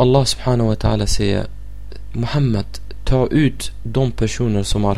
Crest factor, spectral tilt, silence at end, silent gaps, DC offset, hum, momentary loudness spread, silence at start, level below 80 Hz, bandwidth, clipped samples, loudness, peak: 16 dB; -6 dB/octave; 0 s; none; 4%; none; 15 LU; 0 s; -28 dBFS; 13.5 kHz; under 0.1%; -19 LUFS; -2 dBFS